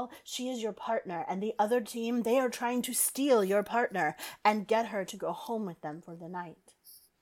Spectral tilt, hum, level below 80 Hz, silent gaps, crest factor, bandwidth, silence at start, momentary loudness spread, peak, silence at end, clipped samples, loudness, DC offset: -3.5 dB/octave; none; -76 dBFS; none; 20 dB; 18 kHz; 0 s; 14 LU; -12 dBFS; 0.25 s; under 0.1%; -31 LUFS; under 0.1%